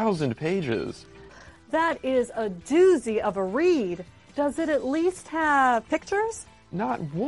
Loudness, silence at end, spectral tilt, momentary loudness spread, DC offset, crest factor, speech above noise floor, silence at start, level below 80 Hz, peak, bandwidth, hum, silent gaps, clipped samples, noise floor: -25 LUFS; 0 s; -5.5 dB/octave; 11 LU; under 0.1%; 16 dB; 24 dB; 0 s; -56 dBFS; -10 dBFS; 11.5 kHz; none; none; under 0.1%; -48 dBFS